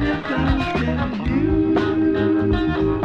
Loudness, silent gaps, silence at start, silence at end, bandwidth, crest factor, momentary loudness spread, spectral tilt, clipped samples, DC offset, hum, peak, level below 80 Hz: -20 LUFS; none; 0 s; 0 s; 7 kHz; 14 dB; 3 LU; -8.5 dB/octave; under 0.1%; under 0.1%; none; -6 dBFS; -30 dBFS